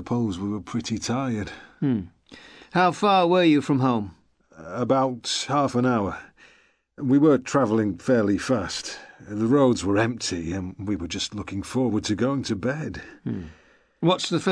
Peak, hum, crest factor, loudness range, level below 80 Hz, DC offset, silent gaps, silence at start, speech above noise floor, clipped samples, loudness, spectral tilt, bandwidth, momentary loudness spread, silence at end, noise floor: -8 dBFS; none; 16 dB; 5 LU; -54 dBFS; under 0.1%; none; 0 s; 36 dB; under 0.1%; -24 LUFS; -5.5 dB/octave; 11 kHz; 14 LU; 0 s; -59 dBFS